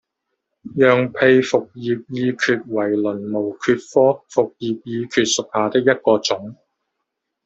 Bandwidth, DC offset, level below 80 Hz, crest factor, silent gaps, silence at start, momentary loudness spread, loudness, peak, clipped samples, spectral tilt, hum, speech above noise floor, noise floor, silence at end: 8.2 kHz; under 0.1%; -62 dBFS; 18 dB; none; 0.65 s; 10 LU; -19 LUFS; -2 dBFS; under 0.1%; -4.5 dB/octave; none; 59 dB; -78 dBFS; 0.9 s